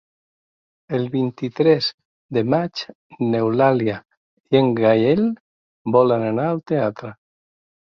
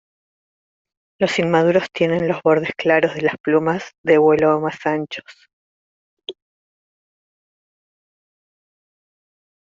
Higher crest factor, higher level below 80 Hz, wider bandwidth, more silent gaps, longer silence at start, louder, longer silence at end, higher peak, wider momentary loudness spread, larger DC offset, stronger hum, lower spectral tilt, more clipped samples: about the same, 18 dB vs 18 dB; about the same, -60 dBFS vs -62 dBFS; second, 6.8 kHz vs 7.8 kHz; first, 1.94-1.98 s, 2.05-2.29 s, 2.95-3.10 s, 4.17-4.44 s, 5.40-5.85 s vs 3.40-3.44 s, 3.98-4.04 s, 5.53-6.17 s; second, 0.9 s vs 1.2 s; about the same, -20 LUFS vs -18 LUFS; second, 0.8 s vs 3.3 s; about the same, -2 dBFS vs -2 dBFS; about the same, 15 LU vs 17 LU; neither; neither; first, -8 dB/octave vs -6.5 dB/octave; neither